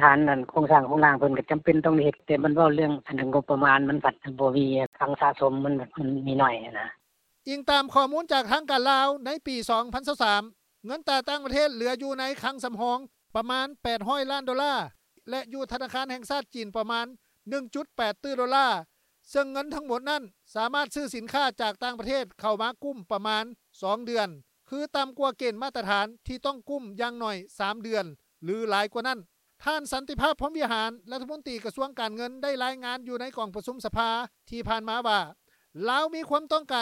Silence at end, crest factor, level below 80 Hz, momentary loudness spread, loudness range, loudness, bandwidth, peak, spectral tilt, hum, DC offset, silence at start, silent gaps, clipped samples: 0 s; 26 dB; -56 dBFS; 13 LU; 8 LU; -27 LUFS; 16 kHz; -2 dBFS; -5 dB/octave; none; under 0.1%; 0 s; 4.86-4.92 s; under 0.1%